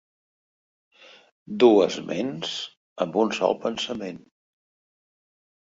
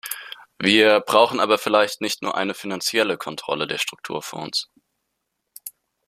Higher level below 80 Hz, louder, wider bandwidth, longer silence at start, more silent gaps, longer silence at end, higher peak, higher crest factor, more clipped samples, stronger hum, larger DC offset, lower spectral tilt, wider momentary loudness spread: about the same, -68 dBFS vs -66 dBFS; second, -24 LUFS vs -21 LUFS; second, 7.8 kHz vs 15 kHz; first, 1.5 s vs 0.05 s; first, 2.77-2.96 s vs none; first, 1.6 s vs 0.4 s; about the same, -4 dBFS vs -2 dBFS; about the same, 22 dB vs 22 dB; neither; neither; neither; first, -5 dB/octave vs -3 dB/octave; about the same, 20 LU vs 22 LU